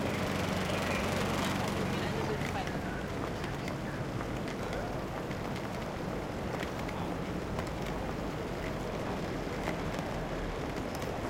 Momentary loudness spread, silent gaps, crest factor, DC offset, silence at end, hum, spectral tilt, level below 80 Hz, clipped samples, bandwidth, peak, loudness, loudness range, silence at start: 5 LU; none; 18 dB; under 0.1%; 0 s; none; -5.5 dB/octave; -46 dBFS; under 0.1%; 17 kHz; -18 dBFS; -35 LUFS; 4 LU; 0 s